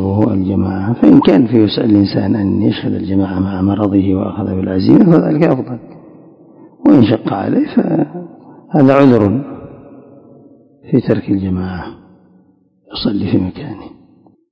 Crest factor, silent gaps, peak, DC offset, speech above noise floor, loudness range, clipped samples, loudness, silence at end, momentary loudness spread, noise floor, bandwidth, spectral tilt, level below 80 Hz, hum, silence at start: 14 dB; none; 0 dBFS; under 0.1%; 40 dB; 8 LU; 0.7%; -13 LUFS; 0.65 s; 17 LU; -52 dBFS; 5.4 kHz; -10 dB/octave; -38 dBFS; none; 0 s